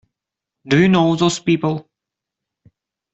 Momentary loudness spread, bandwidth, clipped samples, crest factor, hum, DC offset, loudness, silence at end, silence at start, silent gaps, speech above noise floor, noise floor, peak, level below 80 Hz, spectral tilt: 8 LU; 8.2 kHz; under 0.1%; 16 dB; none; under 0.1%; -16 LUFS; 1.3 s; 0.65 s; none; 69 dB; -84 dBFS; -2 dBFS; -56 dBFS; -6 dB/octave